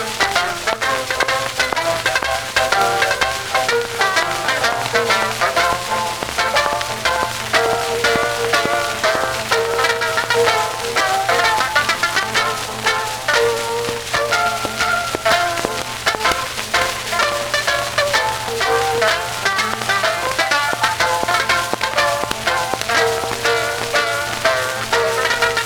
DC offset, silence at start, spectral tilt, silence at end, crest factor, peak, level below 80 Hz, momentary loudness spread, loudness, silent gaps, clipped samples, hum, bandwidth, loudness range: under 0.1%; 0 s; -1.5 dB/octave; 0 s; 16 dB; -2 dBFS; -44 dBFS; 4 LU; -17 LUFS; none; under 0.1%; none; over 20 kHz; 1 LU